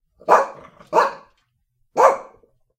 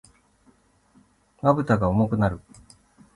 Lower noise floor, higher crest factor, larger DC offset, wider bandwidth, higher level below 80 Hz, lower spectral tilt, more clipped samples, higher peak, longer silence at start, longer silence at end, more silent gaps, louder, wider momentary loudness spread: first, -68 dBFS vs -60 dBFS; about the same, 20 dB vs 20 dB; neither; first, 16 kHz vs 11.5 kHz; second, -66 dBFS vs -46 dBFS; second, -3.5 dB/octave vs -9 dB/octave; neither; first, 0 dBFS vs -6 dBFS; second, 0.25 s vs 1.45 s; second, 0.55 s vs 0.75 s; neither; first, -19 LUFS vs -23 LUFS; first, 12 LU vs 5 LU